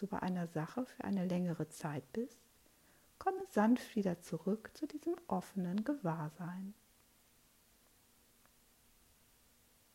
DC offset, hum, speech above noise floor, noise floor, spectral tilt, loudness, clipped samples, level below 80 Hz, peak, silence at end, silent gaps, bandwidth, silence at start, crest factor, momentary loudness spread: under 0.1%; none; 31 dB; -70 dBFS; -7 dB/octave; -39 LUFS; under 0.1%; -76 dBFS; -22 dBFS; 3.2 s; none; 16 kHz; 0 s; 20 dB; 10 LU